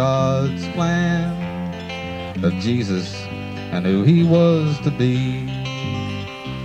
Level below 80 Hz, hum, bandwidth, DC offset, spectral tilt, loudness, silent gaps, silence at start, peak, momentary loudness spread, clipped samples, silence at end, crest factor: -46 dBFS; none; 8.2 kHz; under 0.1%; -7 dB/octave; -20 LUFS; none; 0 s; -4 dBFS; 13 LU; under 0.1%; 0 s; 16 dB